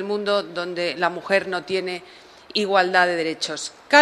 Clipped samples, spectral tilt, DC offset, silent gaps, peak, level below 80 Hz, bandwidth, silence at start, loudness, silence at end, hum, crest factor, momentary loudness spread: under 0.1%; -3 dB/octave; under 0.1%; none; 0 dBFS; -68 dBFS; 12.5 kHz; 0 s; -22 LUFS; 0 s; none; 22 dB; 10 LU